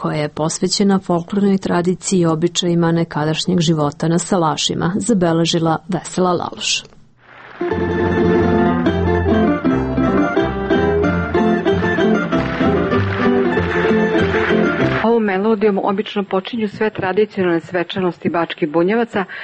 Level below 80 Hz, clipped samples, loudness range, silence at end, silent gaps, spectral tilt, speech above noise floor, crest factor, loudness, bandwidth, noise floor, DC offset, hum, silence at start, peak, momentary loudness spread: -38 dBFS; under 0.1%; 3 LU; 0 s; none; -5.5 dB/octave; 26 dB; 14 dB; -17 LUFS; 8.8 kHz; -43 dBFS; under 0.1%; none; 0 s; -4 dBFS; 5 LU